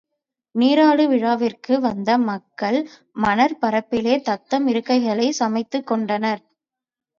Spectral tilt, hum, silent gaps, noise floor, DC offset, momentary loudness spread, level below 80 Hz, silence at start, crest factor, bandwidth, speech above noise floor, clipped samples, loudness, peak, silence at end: -5 dB/octave; none; none; -88 dBFS; under 0.1%; 9 LU; -60 dBFS; 0.55 s; 16 dB; 7.4 kHz; 69 dB; under 0.1%; -20 LUFS; -4 dBFS; 0.8 s